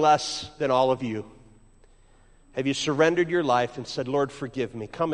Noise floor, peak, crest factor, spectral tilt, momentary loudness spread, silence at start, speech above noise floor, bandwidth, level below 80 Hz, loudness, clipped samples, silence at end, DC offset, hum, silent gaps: -55 dBFS; -8 dBFS; 18 dB; -4.5 dB/octave; 11 LU; 0 s; 31 dB; 11 kHz; -56 dBFS; -26 LUFS; under 0.1%; 0 s; under 0.1%; none; none